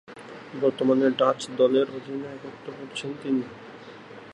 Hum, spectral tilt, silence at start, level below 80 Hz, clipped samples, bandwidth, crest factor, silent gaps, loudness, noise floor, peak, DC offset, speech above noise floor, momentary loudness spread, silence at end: none; -5.5 dB/octave; 0.1 s; -72 dBFS; under 0.1%; 11 kHz; 20 dB; none; -25 LUFS; -44 dBFS; -8 dBFS; under 0.1%; 19 dB; 21 LU; 0 s